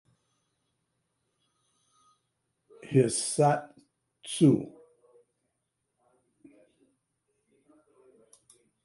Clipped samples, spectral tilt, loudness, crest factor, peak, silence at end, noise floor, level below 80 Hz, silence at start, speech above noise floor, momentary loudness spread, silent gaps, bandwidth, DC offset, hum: under 0.1%; -5.5 dB/octave; -26 LUFS; 22 dB; -10 dBFS; 4.15 s; -81 dBFS; -74 dBFS; 2.85 s; 57 dB; 16 LU; none; 11.5 kHz; under 0.1%; none